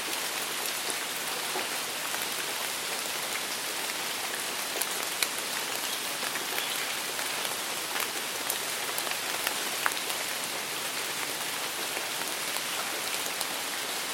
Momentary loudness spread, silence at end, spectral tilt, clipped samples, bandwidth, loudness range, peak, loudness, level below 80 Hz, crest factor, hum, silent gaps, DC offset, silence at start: 2 LU; 0 s; 0.5 dB/octave; under 0.1%; 17 kHz; 1 LU; -6 dBFS; -30 LUFS; -76 dBFS; 28 dB; none; none; under 0.1%; 0 s